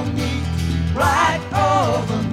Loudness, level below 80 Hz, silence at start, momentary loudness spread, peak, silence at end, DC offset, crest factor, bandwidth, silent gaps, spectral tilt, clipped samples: -19 LUFS; -32 dBFS; 0 s; 6 LU; -4 dBFS; 0 s; under 0.1%; 14 dB; 15.5 kHz; none; -5.5 dB/octave; under 0.1%